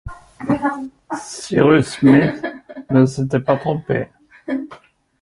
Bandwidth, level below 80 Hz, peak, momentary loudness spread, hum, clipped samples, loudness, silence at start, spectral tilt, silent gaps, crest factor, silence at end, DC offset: 11.5 kHz; -48 dBFS; 0 dBFS; 18 LU; none; under 0.1%; -18 LUFS; 0.05 s; -7 dB/octave; none; 18 dB; 0.45 s; under 0.1%